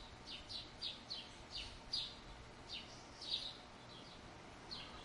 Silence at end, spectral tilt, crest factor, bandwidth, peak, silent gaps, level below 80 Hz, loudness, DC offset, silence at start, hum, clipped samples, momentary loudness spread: 0 s; -2.5 dB/octave; 22 dB; 11.5 kHz; -28 dBFS; none; -64 dBFS; -48 LUFS; under 0.1%; 0 s; none; under 0.1%; 13 LU